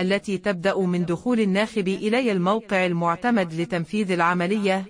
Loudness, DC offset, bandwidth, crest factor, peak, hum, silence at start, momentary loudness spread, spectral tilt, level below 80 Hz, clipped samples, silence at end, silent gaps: -23 LUFS; under 0.1%; 11 kHz; 16 dB; -8 dBFS; none; 0 s; 4 LU; -6.5 dB/octave; -60 dBFS; under 0.1%; 0 s; none